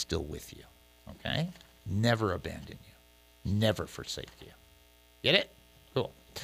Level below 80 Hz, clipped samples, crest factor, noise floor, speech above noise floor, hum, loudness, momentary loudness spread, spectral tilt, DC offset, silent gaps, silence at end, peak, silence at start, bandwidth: -54 dBFS; under 0.1%; 28 dB; -61 dBFS; 28 dB; 60 Hz at -55 dBFS; -32 LUFS; 22 LU; -5 dB/octave; under 0.1%; none; 0 s; -8 dBFS; 0 s; 15.5 kHz